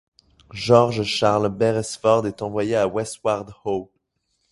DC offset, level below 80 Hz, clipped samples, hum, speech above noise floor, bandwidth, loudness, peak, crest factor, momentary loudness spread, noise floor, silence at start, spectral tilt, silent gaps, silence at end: under 0.1%; -54 dBFS; under 0.1%; none; 52 dB; 11.5 kHz; -21 LUFS; 0 dBFS; 22 dB; 11 LU; -72 dBFS; 0.55 s; -5.5 dB/octave; none; 0.7 s